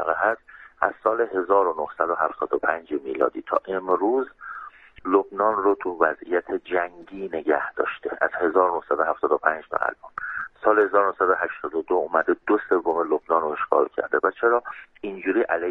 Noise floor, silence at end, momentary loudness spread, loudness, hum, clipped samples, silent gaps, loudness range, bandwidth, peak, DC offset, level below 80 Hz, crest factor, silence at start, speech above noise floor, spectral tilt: -42 dBFS; 0 s; 10 LU; -23 LUFS; none; under 0.1%; none; 2 LU; 4 kHz; -4 dBFS; under 0.1%; -64 dBFS; 20 dB; 0 s; 19 dB; -7.5 dB/octave